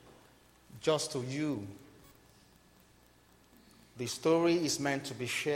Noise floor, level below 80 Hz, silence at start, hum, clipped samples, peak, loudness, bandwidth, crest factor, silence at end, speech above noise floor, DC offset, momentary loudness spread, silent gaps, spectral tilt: -63 dBFS; -70 dBFS; 0.05 s; 60 Hz at -70 dBFS; under 0.1%; -16 dBFS; -33 LUFS; 16 kHz; 20 dB; 0 s; 31 dB; under 0.1%; 13 LU; none; -4 dB/octave